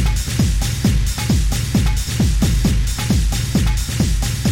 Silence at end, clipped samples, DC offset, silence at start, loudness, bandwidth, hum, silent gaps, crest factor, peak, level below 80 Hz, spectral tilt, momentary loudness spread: 0 s; under 0.1%; under 0.1%; 0 s; -18 LUFS; 16.5 kHz; none; none; 12 dB; -4 dBFS; -20 dBFS; -5 dB/octave; 2 LU